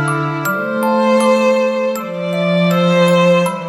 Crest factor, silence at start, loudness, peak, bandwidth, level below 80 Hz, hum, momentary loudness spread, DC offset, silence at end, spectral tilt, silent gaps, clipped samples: 12 dB; 0 s; -14 LUFS; -2 dBFS; 16 kHz; -62 dBFS; none; 7 LU; under 0.1%; 0 s; -6 dB/octave; none; under 0.1%